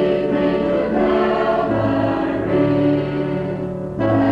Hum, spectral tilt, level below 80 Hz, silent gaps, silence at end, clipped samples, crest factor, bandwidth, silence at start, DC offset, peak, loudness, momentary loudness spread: none; -9 dB/octave; -42 dBFS; none; 0 s; under 0.1%; 12 dB; 5.8 kHz; 0 s; under 0.1%; -6 dBFS; -19 LUFS; 6 LU